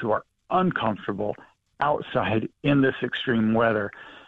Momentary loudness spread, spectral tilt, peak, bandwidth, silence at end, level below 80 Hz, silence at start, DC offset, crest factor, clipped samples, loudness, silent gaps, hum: 9 LU; -8.5 dB/octave; -10 dBFS; 4.8 kHz; 0.05 s; -56 dBFS; 0 s; under 0.1%; 14 dB; under 0.1%; -25 LUFS; none; none